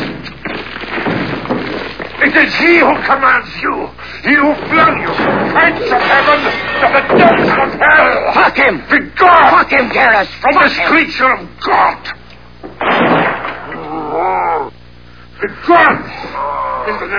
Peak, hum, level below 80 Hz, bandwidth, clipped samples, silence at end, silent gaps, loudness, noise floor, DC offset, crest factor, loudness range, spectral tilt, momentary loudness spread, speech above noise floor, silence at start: 0 dBFS; 60 Hz at -40 dBFS; -40 dBFS; 5.4 kHz; 0.1%; 0 s; none; -11 LUFS; -38 dBFS; 1%; 12 dB; 6 LU; -6 dB/octave; 14 LU; 27 dB; 0 s